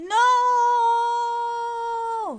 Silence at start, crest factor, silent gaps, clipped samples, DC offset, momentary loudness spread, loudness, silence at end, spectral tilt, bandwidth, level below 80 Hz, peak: 0 s; 12 dB; none; under 0.1%; under 0.1%; 9 LU; -21 LUFS; 0 s; -1 dB/octave; 9.6 kHz; -68 dBFS; -10 dBFS